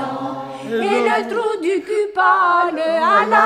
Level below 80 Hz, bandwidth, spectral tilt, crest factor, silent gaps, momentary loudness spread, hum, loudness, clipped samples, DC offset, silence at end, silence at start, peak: -64 dBFS; 14 kHz; -4.5 dB/octave; 16 dB; none; 11 LU; none; -17 LUFS; under 0.1%; under 0.1%; 0 s; 0 s; 0 dBFS